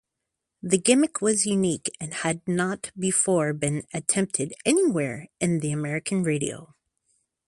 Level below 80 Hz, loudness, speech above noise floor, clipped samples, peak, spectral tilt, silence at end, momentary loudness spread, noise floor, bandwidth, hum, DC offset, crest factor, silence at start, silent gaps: -64 dBFS; -24 LUFS; 59 dB; under 0.1%; -4 dBFS; -4.5 dB/octave; 0.8 s; 8 LU; -83 dBFS; 11.5 kHz; none; under 0.1%; 22 dB; 0.65 s; none